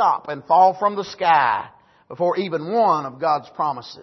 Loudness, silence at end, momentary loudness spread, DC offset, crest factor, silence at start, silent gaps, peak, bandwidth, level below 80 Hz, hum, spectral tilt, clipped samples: -20 LUFS; 0 s; 9 LU; under 0.1%; 16 dB; 0 s; none; -4 dBFS; 6.2 kHz; -70 dBFS; none; -5.5 dB/octave; under 0.1%